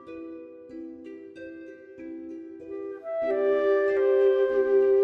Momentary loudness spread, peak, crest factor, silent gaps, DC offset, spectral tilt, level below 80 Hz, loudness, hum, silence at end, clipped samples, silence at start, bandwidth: 21 LU; -12 dBFS; 14 dB; none; under 0.1%; -6.5 dB/octave; -66 dBFS; -24 LUFS; none; 0 s; under 0.1%; 0 s; 4.7 kHz